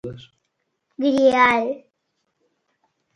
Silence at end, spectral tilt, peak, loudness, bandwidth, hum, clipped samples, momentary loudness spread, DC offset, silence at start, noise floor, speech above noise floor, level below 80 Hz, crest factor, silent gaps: 1.4 s; -5 dB/octave; -2 dBFS; -18 LUFS; 11 kHz; none; under 0.1%; 19 LU; under 0.1%; 0.05 s; -75 dBFS; 56 dB; -60 dBFS; 20 dB; none